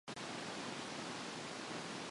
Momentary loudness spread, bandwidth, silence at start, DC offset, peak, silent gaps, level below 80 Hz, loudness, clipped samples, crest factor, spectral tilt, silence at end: 1 LU; 11.5 kHz; 0.05 s; under 0.1%; -32 dBFS; none; -78 dBFS; -45 LUFS; under 0.1%; 14 dB; -3 dB/octave; 0 s